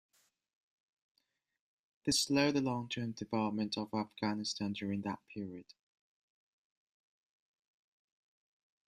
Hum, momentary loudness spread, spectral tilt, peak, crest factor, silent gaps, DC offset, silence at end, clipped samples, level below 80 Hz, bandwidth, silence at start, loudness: none; 13 LU; -4 dB/octave; -16 dBFS; 22 dB; none; under 0.1%; 3.25 s; under 0.1%; -74 dBFS; 13 kHz; 2.05 s; -36 LUFS